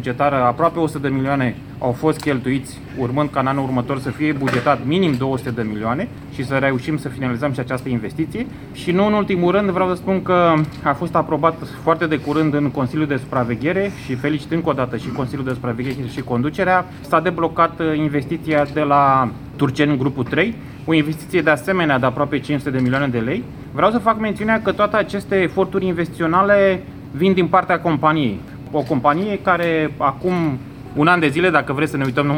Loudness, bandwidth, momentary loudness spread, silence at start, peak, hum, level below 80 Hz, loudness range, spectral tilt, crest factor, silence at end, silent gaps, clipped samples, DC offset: -19 LUFS; 17.5 kHz; 8 LU; 0 s; 0 dBFS; none; -46 dBFS; 4 LU; -7 dB/octave; 18 dB; 0 s; none; under 0.1%; 0.1%